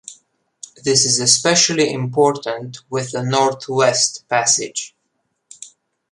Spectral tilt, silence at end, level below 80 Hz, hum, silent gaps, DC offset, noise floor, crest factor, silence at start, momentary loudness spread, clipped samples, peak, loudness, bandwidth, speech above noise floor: -2.5 dB/octave; 0.45 s; -62 dBFS; none; none; under 0.1%; -71 dBFS; 18 dB; 0.1 s; 15 LU; under 0.1%; 0 dBFS; -16 LUFS; 11.5 kHz; 53 dB